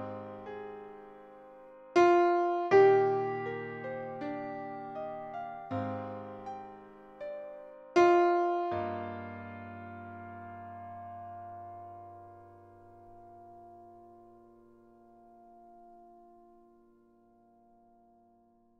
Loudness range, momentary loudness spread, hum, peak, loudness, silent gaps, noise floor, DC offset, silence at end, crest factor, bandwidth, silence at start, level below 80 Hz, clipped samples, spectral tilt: 20 LU; 28 LU; none; -12 dBFS; -30 LUFS; none; -66 dBFS; under 0.1%; 2.7 s; 22 dB; 7.2 kHz; 0 s; -72 dBFS; under 0.1%; -6.5 dB/octave